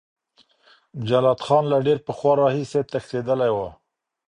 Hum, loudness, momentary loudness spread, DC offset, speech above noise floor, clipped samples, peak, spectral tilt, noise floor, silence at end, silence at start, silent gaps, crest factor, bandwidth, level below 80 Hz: none; -21 LUFS; 9 LU; under 0.1%; 40 dB; under 0.1%; -6 dBFS; -7 dB/octave; -61 dBFS; 0.55 s; 0.95 s; none; 18 dB; 10.5 kHz; -58 dBFS